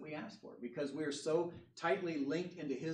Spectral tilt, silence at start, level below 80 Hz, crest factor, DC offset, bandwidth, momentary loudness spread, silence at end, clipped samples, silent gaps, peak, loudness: -5.5 dB/octave; 0 s; -82 dBFS; 18 dB; under 0.1%; 10.5 kHz; 11 LU; 0 s; under 0.1%; none; -22 dBFS; -40 LUFS